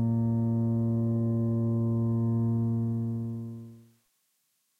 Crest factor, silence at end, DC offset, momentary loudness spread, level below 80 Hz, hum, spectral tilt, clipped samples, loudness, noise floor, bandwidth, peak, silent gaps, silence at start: 10 dB; 1 s; under 0.1%; 8 LU; -58 dBFS; none; -12.5 dB/octave; under 0.1%; -29 LUFS; -75 dBFS; 1.8 kHz; -18 dBFS; none; 0 s